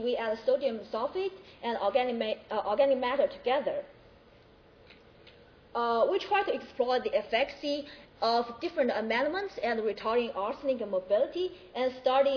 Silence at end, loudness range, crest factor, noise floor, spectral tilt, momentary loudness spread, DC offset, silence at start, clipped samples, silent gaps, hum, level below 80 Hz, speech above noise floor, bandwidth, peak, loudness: 0 s; 3 LU; 18 dB; -58 dBFS; -5 dB/octave; 8 LU; under 0.1%; 0 s; under 0.1%; none; none; -66 dBFS; 28 dB; 5.4 kHz; -12 dBFS; -30 LUFS